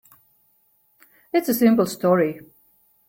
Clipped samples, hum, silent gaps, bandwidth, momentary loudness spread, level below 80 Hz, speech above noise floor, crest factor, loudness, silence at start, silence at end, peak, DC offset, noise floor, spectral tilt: under 0.1%; none; none; 16.5 kHz; 8 LU; -66 dBFS; 44 dB; 18 dB; -20 LUFS; 1.35 s; 0.7 s; -6 dBFS; under 0.1%; -63 dBFS; -6 dB/octave